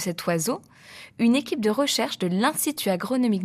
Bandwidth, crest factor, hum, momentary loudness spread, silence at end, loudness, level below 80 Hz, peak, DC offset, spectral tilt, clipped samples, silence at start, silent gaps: 15.5 kHz; 16 dB; none; 7 LU; 0 s; -24 LUFS; -68 dBFS; -8 dBFS; under 0.1%; -4 dB/octave; under 0.1%; 0 s; none